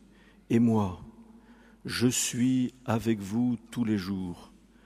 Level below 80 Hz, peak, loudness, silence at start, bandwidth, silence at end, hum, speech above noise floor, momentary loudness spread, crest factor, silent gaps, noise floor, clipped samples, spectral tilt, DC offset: -60 dBFS; -12 dBFS; -28 LUFS; 0.5 s; 15.5 kHz; 0.4 s; none; 29 dB; 12 LU; 18 dB; none; -57 dBFS; under 0.1%; -5 dB/octave; under 0.1%